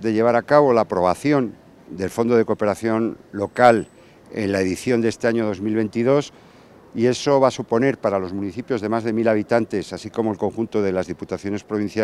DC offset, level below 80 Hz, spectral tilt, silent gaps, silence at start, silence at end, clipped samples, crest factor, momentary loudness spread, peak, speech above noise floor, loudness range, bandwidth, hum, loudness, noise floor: under 0.1%; -60 dBFS; -6.5 dB/octave; none; 0 s; 0 s; under 0.1%; 20 dB; 12 LU; 0 dBFS; 27 dB; 3 LU; 13.5 kHz; none; -21 LUFS; -47 dBFS